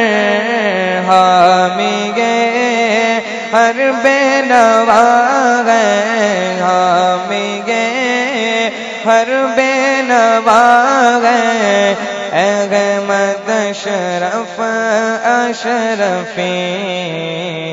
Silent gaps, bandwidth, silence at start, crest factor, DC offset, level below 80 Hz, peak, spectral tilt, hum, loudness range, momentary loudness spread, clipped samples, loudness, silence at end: none; 9.4 kHz; 0 s; 12 dB; under 0.1%; -60 dBFS; 0 dBFS; -3.5 dB/octave; none; 4 LU; 9 LU; 0.2%; -12 LUFS; 0 s